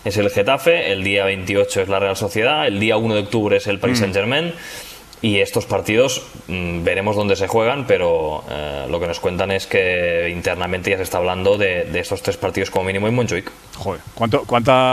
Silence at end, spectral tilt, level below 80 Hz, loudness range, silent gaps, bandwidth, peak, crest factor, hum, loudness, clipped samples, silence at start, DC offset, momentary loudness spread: 0 s; -4.5 dB/octave; -44 dBFS; 3 LU; none; 14.5 kHz; -2 dBFS; 18 dB; none; -18 LUFS; under 0.1%; 0 s; under 0.1%; 9 LU